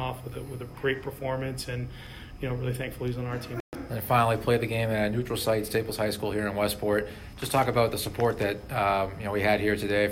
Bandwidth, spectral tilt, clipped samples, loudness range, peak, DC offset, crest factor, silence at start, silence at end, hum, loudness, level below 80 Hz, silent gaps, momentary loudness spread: 16 kHz; -5.5 dB/octave; under 0.1%; 6 LU; -10 dBFS; under 0.1%; 18 dB; 0 s; 0 s; none; -28 LUFS; -48 dBFS; 3.60-3.72 s; 12 LU